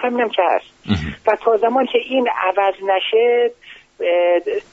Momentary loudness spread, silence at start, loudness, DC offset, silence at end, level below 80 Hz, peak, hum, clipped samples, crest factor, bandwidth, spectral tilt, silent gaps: 7 LU; 0 s; -18 LUFS; under 0.1%; 0.1 s; -46 dBFS; -2 dBFS; none; under 0.1%; 16 dB; 7.6 kHz; -3 dB/octave; none